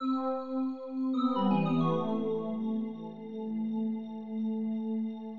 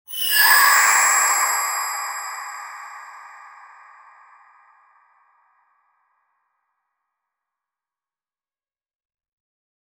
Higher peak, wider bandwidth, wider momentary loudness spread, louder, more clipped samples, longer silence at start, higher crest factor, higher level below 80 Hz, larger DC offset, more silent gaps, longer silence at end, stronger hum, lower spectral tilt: second, -18 dBFS vs -2 dBFS; second, 4.7 kHz vs over 20 kHz; second, 10 LU vs 24 LU; second, -33 LUFS vs -16 LUFS; neither; about the same, 0 s vs 0.1 s; second, 14 dB vs 22 dB; second, -84 dBFS vs -76 dBFS; neither; neither; second, 0 s vs 6.5 s; neither; first, -7.5 dB/octave vs 4.5 dB/octave